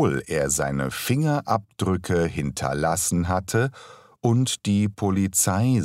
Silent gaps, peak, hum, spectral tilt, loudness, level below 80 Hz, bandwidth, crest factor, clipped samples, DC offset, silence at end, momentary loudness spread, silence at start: none; -8 dBFS; none; -5 dB/octave; -23 LUFS; -46 dBFS; 16 kHz; 16 dB; under 0.1%; under 0.1%; 0 s; 6 LU; 0 s